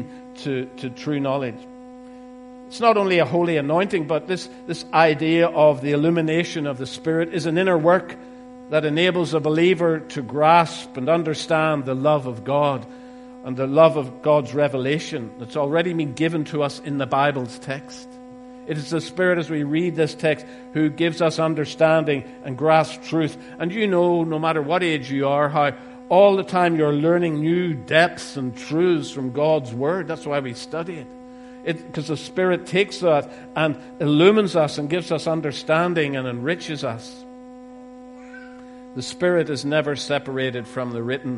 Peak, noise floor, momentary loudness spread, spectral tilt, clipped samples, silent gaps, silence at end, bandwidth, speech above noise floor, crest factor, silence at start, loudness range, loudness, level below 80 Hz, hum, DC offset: 0 dBFS; -40 dBFS; 20 LU; -6 dB/octave; under 0.1%; none; 0 s; 11.5 kHz; 20 dB; 20 dB; 0 s; 6 LU; -21 LUFS; -62 dBFS; none; under 0.1%